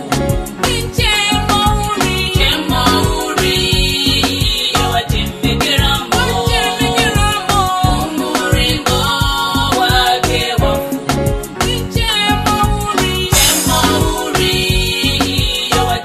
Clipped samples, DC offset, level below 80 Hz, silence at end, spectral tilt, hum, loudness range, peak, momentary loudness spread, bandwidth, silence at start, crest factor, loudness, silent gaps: under 0.1%; under 0.1%; -22 dBFS; 0 s; -3.5 dB/octave; none; 1 LU; 0 dBFS; 5 LU; 14 kHz; 0 s; 14 dB; -13 LUFS; none